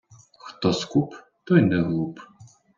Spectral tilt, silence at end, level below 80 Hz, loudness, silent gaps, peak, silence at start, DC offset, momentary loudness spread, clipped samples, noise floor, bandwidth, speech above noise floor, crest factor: -6.5 dB/octave; 0.35 s; -60 dBFS; -23 LUFS; none; -4 dBFS; 0.45 s; under 0.1%; 25 LU; under 0.1%; -46 dBFS; 7.6 kHz; 24 dB; 20 dB